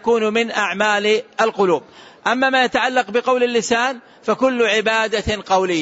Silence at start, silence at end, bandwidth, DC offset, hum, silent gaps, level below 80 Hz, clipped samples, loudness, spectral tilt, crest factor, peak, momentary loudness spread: 0.05 s; 0 s; 8 kHz; under 0.1%; none; none; -48 dBFS; under 0.1%; -18 LUFS; -3.5 dB/octave; 14 dB; -4 dBFS; 6 LU